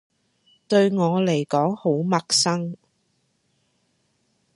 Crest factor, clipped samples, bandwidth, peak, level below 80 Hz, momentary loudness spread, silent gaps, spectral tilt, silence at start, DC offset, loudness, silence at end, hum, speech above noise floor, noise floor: 18 dB; under 0.1%; 11.5 kHz; -6 dBFS; -70 dBFS; 8 LU; none; -4.5 dB/octave; 0.7 s; under 0.1%; -21 LUFS; 1.8 s; none; 48 dB; -69 dBFS